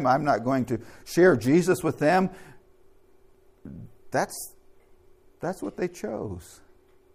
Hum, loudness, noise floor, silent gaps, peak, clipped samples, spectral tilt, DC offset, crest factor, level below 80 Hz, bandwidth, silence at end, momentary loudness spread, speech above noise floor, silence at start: none; -25 LUFS; -57 dBFS; none; -8 dBFS; under 0.1%; -6 dB/octave; under 0.1%; 20 dB; -58 dBFS; 15.5 kHz; 0.7 s; 21 LU; 32 dB; 0 s